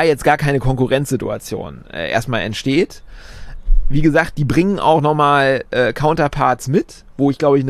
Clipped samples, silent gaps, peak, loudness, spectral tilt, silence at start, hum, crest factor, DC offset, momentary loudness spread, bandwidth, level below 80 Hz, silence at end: under 0.1%; none; -2 dBFS; -17 LUFS; -6 dB/octave; 0 s; none; 14 dB; under 0.1%; 11 LU; 13.5 kHz; -26 dBFS; 0 s